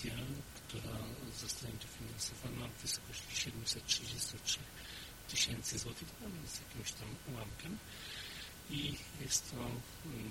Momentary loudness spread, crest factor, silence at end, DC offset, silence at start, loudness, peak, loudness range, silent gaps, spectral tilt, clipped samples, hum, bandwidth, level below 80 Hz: 12 LU; 24 dB; 0 s; under 0.1%; 0 s; -42 LUFS; -18 dBFS; 6 LU; none; -2.5 dB/octave; under 0.1%; none; 16.5 kHz; -58 dBFS